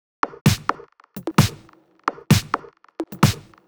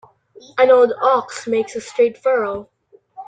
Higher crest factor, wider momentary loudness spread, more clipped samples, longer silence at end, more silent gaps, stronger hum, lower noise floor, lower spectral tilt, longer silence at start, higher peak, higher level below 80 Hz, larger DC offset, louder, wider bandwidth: first, 22 dB vs 16 dB; about the same, 15 LU vs 13 LU; neither; first, 0.25 s vs 0.05 s; first, 0.41-0.45 s vs none; neither; first, -52 dBFS vs -41 dBFS; about the same, -5 dB/octave vs -4 dB/octave; second, 0.25 s vs 0.55 s; about the same, 0 dBFS vs -2 dBFS; first, -44 dBFS vs -62 dBFS; neither; second, -22 LUFS vs -17 LUFS; first, over 20 kHz vs 9.2 kHz